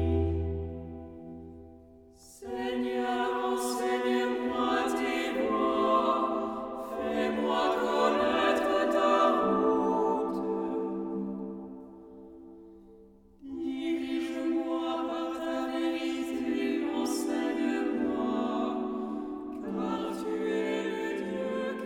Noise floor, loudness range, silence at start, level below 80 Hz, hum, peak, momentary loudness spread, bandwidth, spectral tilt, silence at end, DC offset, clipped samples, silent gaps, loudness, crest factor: -55 dBFS; 8 LU; 0 s; -50 dBFS; none; -12 dBFS; 17 LU; 17 kHz; -5.5 dB/octave; 0 s; under 0.1%; under 0.1%; none; -30 LUFS; 18 dB